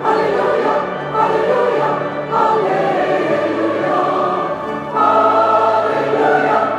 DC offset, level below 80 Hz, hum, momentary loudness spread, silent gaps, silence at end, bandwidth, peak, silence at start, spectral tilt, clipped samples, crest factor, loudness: under 0.1%; -58 dBFS; none; 7 LU; none; 0 s; 11 kHz; -2 dBFS; 0 s; -6.5 dB/octave; under 0.1%; 14 dB; -15 LUFS